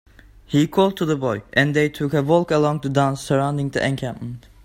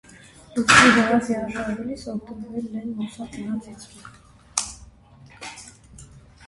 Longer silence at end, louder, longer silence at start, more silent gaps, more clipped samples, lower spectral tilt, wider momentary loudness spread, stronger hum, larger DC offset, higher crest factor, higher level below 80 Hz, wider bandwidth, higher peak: about the same, 0.25 s vs 0.3 s; about the same, -20 LUFS vs -21 LUFS; about the same, 0.5 s vs 0.55 s; neither; neither; first, -6.5 dB/octave vs -3 dB/octave; second, 6 LU vs 25 LU; neither; neither; second, 18 dB vs 24 dB; about the same, -50 dBFS vs -50 dBFS; first, 16 kHz vs 11.5 kHz; about the same, -2 dBFS vs 0 dBFS